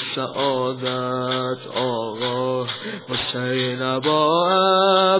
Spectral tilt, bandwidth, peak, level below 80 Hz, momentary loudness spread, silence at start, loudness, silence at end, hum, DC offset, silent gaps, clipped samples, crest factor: -9 dB/octave; 4 kHz; -4 dBFS; -62 dBFS; 9 LU; 0 s; -21 LUFS; 0 s; none; under 0.1%; none; under 0.1%; 16 dB